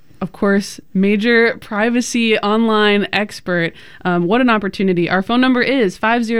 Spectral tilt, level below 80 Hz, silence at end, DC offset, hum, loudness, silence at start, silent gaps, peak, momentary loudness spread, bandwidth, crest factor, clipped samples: -5 dB/octave; -50 dBFS; 0 s; 1%; none; -16 LUFS; 0.2 s; none; -2 dBFS; 7 LU; 13 kHz; 14 dB; under 0.1%